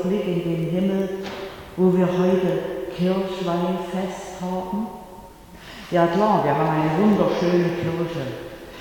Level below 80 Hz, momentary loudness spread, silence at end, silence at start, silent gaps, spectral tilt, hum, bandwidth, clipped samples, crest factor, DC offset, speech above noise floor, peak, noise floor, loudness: -50 dBFS; 15 LU; 0 s; 0 s; none; -7.5 dB/octave; none; 18.5 kHz; under 0.1%; 16 dB; under 0.1%; 21 dB; -6 dBFS; -42 dBFS; -22 LUFS